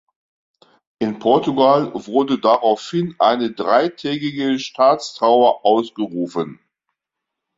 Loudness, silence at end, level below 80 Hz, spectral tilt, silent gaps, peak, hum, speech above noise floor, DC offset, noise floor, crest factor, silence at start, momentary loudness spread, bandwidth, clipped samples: -18 LUFS; 1.05 s; -64 dBFS; -6 dB/octave; none; -2 dBFS; none; 65 dB; under 0.1%; -82 dBFS; 16 dB; 1 s; 10 LU; 7.8 kHz; under 0.1%